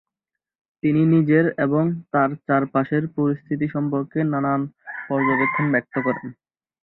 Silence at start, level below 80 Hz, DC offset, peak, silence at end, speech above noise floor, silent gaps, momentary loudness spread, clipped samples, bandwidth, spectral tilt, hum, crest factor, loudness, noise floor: 0.85 s; -62 dBFS; under 0.1%; -6 dBFS; 0.5 s; 65 dB; none; 8 LU; under 0.1%; 4.1 kHz; -12 dB/octave; none; 16 dB; -21 LUFS; -86 dBFS